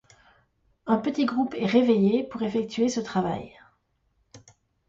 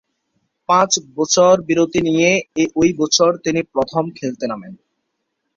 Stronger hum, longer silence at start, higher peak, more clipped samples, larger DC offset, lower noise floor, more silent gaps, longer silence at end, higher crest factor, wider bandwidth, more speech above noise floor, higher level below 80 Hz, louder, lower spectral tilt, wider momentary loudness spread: neither; first, 0.85 s vs 0.7 s; second, -8 dBFS vs -2 dBFS; neither; neither; about the same, -71 dBFS vs -73 dBFS; neither; second, 0.5 s vs 0.8 s; about the same, 18 dB vs 16 dB; about the same, 7.8 kHz vs 7.6 kHz; second, 46 dB vs 57 dB; second, -62 dBFS vs -52 dBFS; second, -25 LUFS vs -16 LUFS; first, -6 dB/octave vs -3.5 dB/octave; about the same, 10 LU vs 11 LU